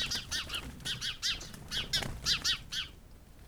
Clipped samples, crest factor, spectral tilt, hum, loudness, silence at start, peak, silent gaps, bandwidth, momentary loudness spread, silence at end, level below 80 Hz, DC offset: under 0.1%; 20 dB; -1 dB/octave; none; -33 LUFS; 0 s; -18 dBFS; none; over 20 kHz; 8 LU; 0 s; -50 dBFS; under 0.1%